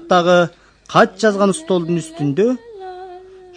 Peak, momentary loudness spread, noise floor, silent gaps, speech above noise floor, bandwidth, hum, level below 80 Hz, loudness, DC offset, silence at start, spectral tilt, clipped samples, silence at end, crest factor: 0 dBFS; 20 LU; -38 dBFS; none; 23 dB; 10.5 kHz; none; -56 dBFS; -16 LUFS; under 0.1%; 0 s; -5.5 dB/octave; under 0.1%; 0.35 s; 18 dB